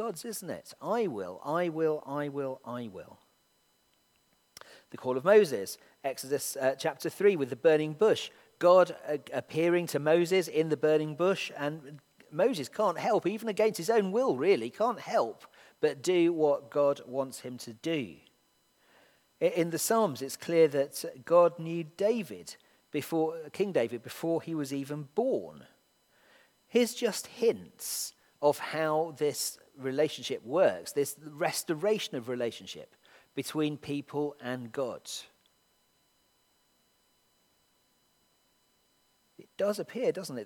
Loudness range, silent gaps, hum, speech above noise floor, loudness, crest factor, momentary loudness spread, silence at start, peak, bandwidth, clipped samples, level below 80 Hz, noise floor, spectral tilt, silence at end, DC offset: 9 LU; none; none; 41 dB; -30 LUFS; 22 dB; 13 LU; 0 s; -10 dBFS; 18.5 kHz; under 0.1%; -82 dBFS; -71 dBFS; -4.5 dB/octave; 0 s; under 0.1%